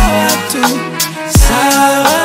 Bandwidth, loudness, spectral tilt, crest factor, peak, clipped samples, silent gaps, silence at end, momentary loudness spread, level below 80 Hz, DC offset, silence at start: 16.5 kHz; -11 LUFS; -3.5 dB/octave; 10 dB; 0 dBFS; 0.2%; none; 0 s; 6 LU; -18 dBFS; under 0.1%; 0 s